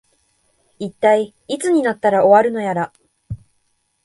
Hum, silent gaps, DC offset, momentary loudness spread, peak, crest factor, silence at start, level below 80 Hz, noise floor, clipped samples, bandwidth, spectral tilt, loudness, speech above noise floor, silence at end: none; none; under 0.1%; 22 LU; 0 dBFS; 18 dB; 0.8 s; -52 dBFS; -66 dBFS; under 0.1%; 11.5 kHz; -5.5 dB/octave; -16 LUFS; 50 dB; 0.7 s